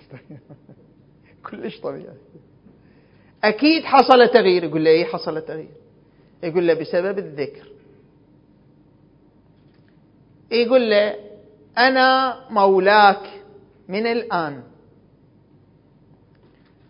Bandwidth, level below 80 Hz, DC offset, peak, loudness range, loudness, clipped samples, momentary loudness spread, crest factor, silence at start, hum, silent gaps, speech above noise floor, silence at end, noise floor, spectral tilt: 6 kHz; -64 dBFS; under 0.1%; 0 dBFS; 13 LU; -18 LUFS; under 0.1%; 19 LU; 20 dB; 0.1 s; none; none; 36 dB; 2.25 s; -54 dBFS; -7 dB/octave